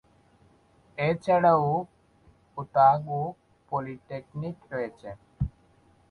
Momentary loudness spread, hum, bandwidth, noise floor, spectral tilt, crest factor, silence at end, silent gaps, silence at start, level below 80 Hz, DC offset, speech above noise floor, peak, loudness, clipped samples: 21 LU; none; 10.5 kHz; -61 dBFS; -8.5 dB/octave; 20 dB; 0.6 s; none; 1 s; -52 dBFS; under 0.1%; 35 dB; -8 dBFS; -27 LUFS; under 0.1%